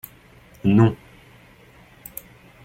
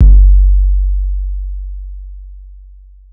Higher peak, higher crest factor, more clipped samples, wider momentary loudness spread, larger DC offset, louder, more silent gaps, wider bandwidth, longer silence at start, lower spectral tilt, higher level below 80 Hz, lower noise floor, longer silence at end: second, -4 dBFS vs 0 dBFS; first, 22 dB vs 10 dB; second, under 0.1% vs 2%; about the same, 24 LU vs 24 LU; neither; second, -19 LUFS vs -14 LUFS; neither; first, 17 kHz vs 0.6 kHz; first, 0.65 s vs 0 s; second, -8.5 dB/octave vs -14 dB/octave; second, -52 dBFS vs -10 dBFS; first, -50 dBFS vs -37 dBFS; first, 1.7 s vs 0.6 s